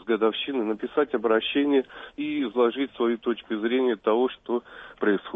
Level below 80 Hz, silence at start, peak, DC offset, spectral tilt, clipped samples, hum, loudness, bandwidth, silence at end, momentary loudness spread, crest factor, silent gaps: -64 dBFS; 0 s; -10 dBFS; under 0.1%; -7.5 dB/octave; under 0.1%; none; -26 LUFS; 3.9 kHz; 0 s; 8 LU; 16 dB; none